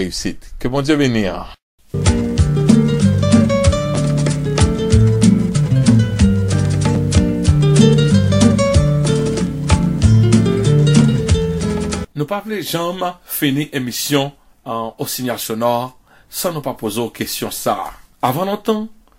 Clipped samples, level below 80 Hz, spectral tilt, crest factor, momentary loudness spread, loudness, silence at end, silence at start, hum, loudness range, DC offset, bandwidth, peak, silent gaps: under 0.1%; -28 dBFS; -6 dB/octave; 14 dB; 11 LU; -16 LUFS; 0.25 s; 0 s; none; 8 LU; under 0.1%; 16 kHz; 0 dBFS; 1.62-1.78 s